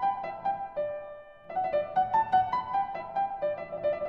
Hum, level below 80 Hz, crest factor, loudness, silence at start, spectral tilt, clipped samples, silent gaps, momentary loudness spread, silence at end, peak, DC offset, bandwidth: none; -62 dBFS; 16 dB; -30 LUFS; 0 s; -6.5 dB/octave; under 0.1%; none; 10 LU; 0 s; -14 dBFS; under 0.1%; 5.8 kHz